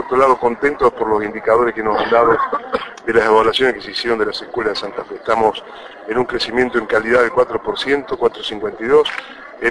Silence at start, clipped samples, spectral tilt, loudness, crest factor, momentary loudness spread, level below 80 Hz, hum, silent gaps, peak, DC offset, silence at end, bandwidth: 0 s; under 0.1%; -4.5 dB/octave; -17 LUFS; 16 dB; 10 LU; -46 dBFS; none; none; -2 dBFS; under 0.1%; 0 s; 11 kHz